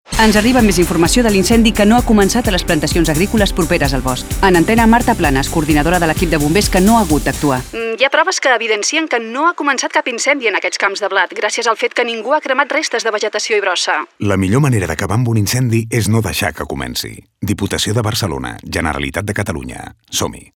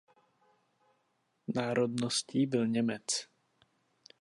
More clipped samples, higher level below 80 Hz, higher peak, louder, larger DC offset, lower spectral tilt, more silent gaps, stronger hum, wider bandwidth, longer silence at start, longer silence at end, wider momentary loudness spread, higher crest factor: neither; first, -28 dBFS vs -78 dBFS; first, 0 dBFS vs -16 dBFS; first, -14 LUFS vs -32 LUFS; neither; about the same, -4.5 dB/octave vs -4.5 dB/octave; neither; neither; first, over 20 kHz vs 11.5 kHz; second, 0.1 s vs 1.5 s; second, 0.15 s vs 0.95 s; first, 9 LU vs 5 LU; second, 14 dB vs 20 dB